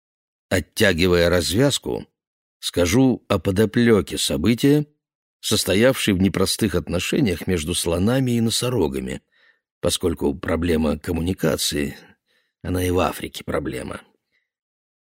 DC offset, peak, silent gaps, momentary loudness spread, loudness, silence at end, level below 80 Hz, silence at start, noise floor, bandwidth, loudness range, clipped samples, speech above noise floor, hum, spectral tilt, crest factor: under 0.1%; -2 dBFS; 2.27-2.60 s, 5.15-5.40 s, 9.71-9.81 s; 12 LU; -21 LUFS; 1 s; -42 dBFS; 0.5 s; -68 dBFS; 16 kHz; 5 LU; under 0.1%; 48 dB; none; -4.5 dB/octave; 18 dB